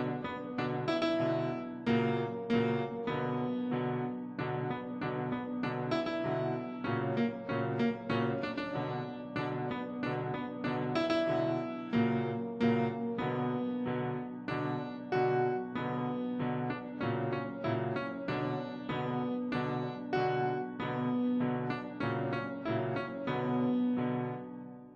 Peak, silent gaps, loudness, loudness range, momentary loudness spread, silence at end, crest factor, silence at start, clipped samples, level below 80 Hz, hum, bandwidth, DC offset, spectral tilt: -18 dBFS; none; -34 LUFS; 3 LU; 6 LU; 0 s; 16 dB; 0 s; under 0.1%; -68 dBFS; none; 7.6 kHz; under 0.1%; -8 dB/octave